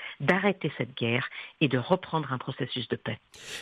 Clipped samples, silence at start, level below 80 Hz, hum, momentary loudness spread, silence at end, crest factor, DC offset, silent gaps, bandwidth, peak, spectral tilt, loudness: under 0.1%; 0 s; -68 dBFS; none; 11 LU; 0 s; 22 dB; under 0.1%; none; 12.5 kHz; -8 dBFS; -6 dB/octave; -29 LUFS